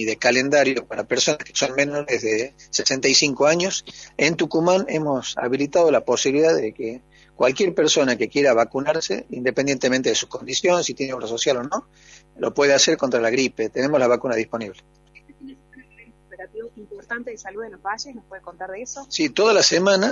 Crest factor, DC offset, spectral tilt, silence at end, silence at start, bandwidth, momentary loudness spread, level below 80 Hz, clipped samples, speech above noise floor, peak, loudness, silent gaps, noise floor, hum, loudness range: 18 dB; under 0.1%; -3 dB/octave; 0 s; 0 s; 7.8 kHz; 17 LU; -58 dBFS; under 0.1%; 30 dB; -2 dBFS; -20 LUFS; none; -51 dBFS; none; 13 LU